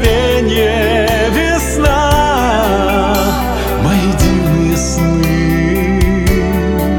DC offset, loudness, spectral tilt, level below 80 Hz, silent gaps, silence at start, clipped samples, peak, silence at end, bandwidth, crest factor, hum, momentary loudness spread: under 0.1%; -12 LUFS; -5.5 dB/octave; -18 dBFS; none; 0 s; under 0.1%; 0 dBFS; 0 s; 18.5 kHz; 12 dB; none; 2 LU